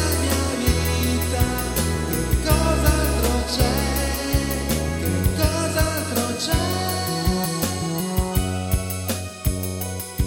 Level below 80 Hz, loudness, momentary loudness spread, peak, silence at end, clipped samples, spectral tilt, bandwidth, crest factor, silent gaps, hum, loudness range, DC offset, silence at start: -28 dBFS; -22 LUFS; 6 LU; -4 dBFS; 0 s; under 0.1%; -4.5 dB/octave; 17 kHz; 18 dB; none; none; 2 LU; under 0.1%; 0 s